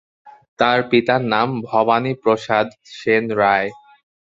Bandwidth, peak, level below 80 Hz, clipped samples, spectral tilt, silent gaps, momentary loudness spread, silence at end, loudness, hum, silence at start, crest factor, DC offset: 7.8 kHz; 0 dBFS; -60 dBFS; under 0.1%; -6.5 dB/octave; 0.48-0.56 s; 4 LU; 0.6 s; -18 LUFS; none; 0.25 s; 18 dB; under 0.1%